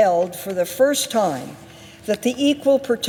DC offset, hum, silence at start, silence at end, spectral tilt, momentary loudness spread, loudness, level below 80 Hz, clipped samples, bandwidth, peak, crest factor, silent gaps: under 0.1%; none; 0 s; 0 s; -3.5 dB/octave; 15 LU; -20 LUFS; -62 dBFS; under 0.1%; 18.5 kHz; -6 dBFS; 14 dB; none